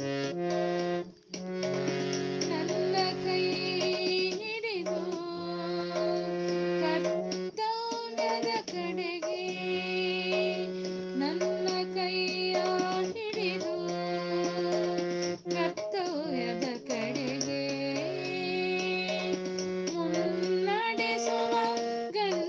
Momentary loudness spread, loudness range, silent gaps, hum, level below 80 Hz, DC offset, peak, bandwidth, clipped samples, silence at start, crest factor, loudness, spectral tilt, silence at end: 5 LU; 2 LU; none; none; -74 dBFS; under 0.1%; -14 dBFS; 7.6 kHz; under 0.1%; 0 s; 18 dB; -31 LUFS; -4.5 dB/octave; 0 s